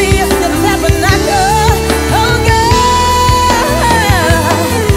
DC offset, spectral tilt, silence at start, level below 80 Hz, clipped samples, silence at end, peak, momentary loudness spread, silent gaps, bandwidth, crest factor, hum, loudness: under 0.1%; -4.5 dB/octave; 0 s; -20 dBFS; under 0.1%; 0 s; 0 dBFS; 3 LU; none; 16.5 kHz; 10 dB; none; -10 LUFS